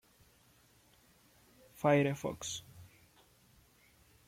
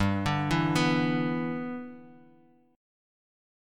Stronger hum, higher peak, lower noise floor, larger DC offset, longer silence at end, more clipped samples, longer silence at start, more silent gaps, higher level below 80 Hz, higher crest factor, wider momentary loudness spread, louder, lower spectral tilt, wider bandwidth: neither; second, -16 dBFS vs -10 dBFS; first, -67 dBFS vs -60 dBFS; neither; second, 1.4 s vs 1.55 s; neither; first, 1.8 s vs 0 s; neither; second, -70 dBFS vs -52 dBFS; about the same, 24 dB vs 20 dB; first, 25 LU vs 13 LU; second, -34 LUFS vs -28 LUFS; about the same, -5.5 dB/octave vs -6 dB/octave; about the same, 16.5 kHz vs 15 kHz